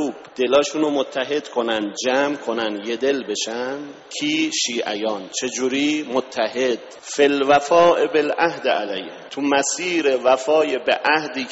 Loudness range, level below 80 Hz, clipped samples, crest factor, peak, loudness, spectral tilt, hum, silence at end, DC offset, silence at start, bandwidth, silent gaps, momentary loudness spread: 4 LU; -66 dBFS; under 0.1%; 18 dB; -2 dBFS; -20 LUFS; -1.5 dB/octave; none; 0 s; under 0.1%; 0 s; 8 kHz; none; 9 LU